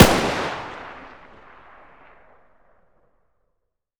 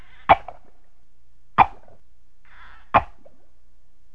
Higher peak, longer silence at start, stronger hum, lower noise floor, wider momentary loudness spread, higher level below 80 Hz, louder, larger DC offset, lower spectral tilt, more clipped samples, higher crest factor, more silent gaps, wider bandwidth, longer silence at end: about the same, 0 dBFS vs 0 dBFS; second, 0 s vs 0.3 s; second, none vs 60 Hz at -60 dBFS; first, -77 dBFS vs -61 dBFS; first, 28 LU vs 17 LU; first, -38 dBFS vs -46 dBFS; about the same, -22 LUFS vs -20 LUFS; second, under 0.1% vs 2%; second, -4.5 dB/octave vs -7 dB/octave; neither; about the same, 24 dB vs 26 dB; neither; first, over 20 kHz vs 5.8 kHz; first, 2.9 s vs 1.1 s